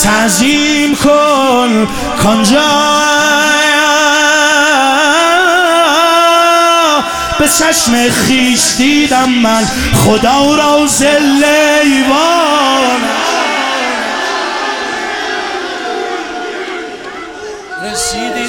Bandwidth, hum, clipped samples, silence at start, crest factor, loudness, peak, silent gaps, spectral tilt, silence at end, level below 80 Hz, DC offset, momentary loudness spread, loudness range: 18.5 kHz; none; under 0.1%; 0 s; 10 dB; -9 LUFS; 0 dBFS; none; -2.5 dB/octave; 0 s; -36 dBFS; 0.5%; 10 LU; 8 LU